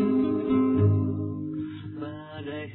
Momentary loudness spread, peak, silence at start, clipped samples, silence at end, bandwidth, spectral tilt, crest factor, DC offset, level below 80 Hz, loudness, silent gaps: 15 LU; -12 dBFS; 0 s; under 0.1%; 0 s; 4.2 kHz; -12.5 dB/octave; 14 dB; under 0.1%; -58 dBFS; -27 LUFS; none